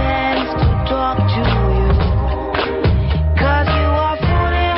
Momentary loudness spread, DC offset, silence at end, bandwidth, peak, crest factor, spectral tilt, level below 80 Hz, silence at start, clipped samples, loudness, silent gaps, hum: 3 LU; under 0.1%; 0 s; 5.8 kHz; -4 dBFS; 10 dB; -5.5 dB/octave; -20 dBFS; 0 s; under 0.1%; -16 LUFS; none; none